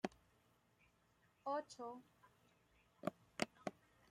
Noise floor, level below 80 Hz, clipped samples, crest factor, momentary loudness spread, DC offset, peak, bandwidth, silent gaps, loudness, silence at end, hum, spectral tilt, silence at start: -77 dBFS; -84 dBFS; under 0.1%; 30 dB; 7 LU; under 0.1%; -20 dBFS; 16 kHz; none; -49 LUFS; 0.4 s; none; -4.5 dB/octave; 0.05 s